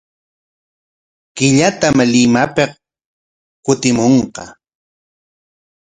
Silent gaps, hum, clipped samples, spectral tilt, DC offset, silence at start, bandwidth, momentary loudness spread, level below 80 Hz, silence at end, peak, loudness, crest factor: 3.05-3.63 s; none; under 0.1%; -4.5 dB/octave; under 0.1%; 1.35 s; 9.6 kHz; 14 LU; -50 dBFS; 1.4 s; 0 dBFS; -13 LUFS; 16 dB